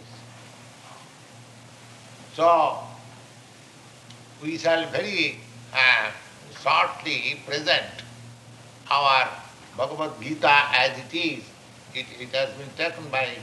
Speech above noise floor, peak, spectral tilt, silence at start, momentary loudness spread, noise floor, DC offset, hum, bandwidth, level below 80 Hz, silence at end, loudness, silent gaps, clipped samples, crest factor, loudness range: 25 dB; -2 dBFS; -3.5 dB/octave; 0 s; 26 LU; -48 dBFS; under 0.1%; none; 12 kHz; -70 dBFS; 0 s; -23 LUFS; none; under 0.1%; 24 dB; 5 LU